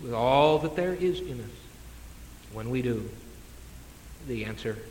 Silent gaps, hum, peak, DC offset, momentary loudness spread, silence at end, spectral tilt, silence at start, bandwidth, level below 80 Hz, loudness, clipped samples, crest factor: none; none; -10 dBFS; under 0.1%; 25 LU; 0 s; -6 dB/octave; 0 s; 17 kHz; -48 dBFS; -28 LUFS; under 0.1%; 20 dB